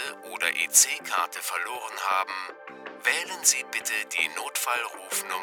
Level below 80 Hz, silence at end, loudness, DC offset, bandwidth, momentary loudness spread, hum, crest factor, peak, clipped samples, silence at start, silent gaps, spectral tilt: -86 dBFS; 0 s; -25 LUFS; under 0.1%; over 20 kHz; 13 LU; none; 24 dB; -4 dBFS; under 0.1%; 0 s; none; 2.5 dB/octave